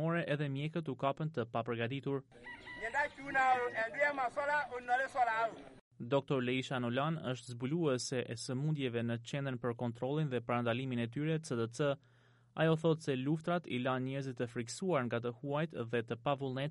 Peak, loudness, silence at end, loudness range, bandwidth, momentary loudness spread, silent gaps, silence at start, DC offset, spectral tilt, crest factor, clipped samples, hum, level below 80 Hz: -20 dBFS; -36 LUFS; 0 s; 3 LU; 11.5 kHz; 7 LU; 5.81-5.91 s; 0 s; under 0.1%; -6 dB/octave; 16 dB; under 0.1%; none; -72 dBFS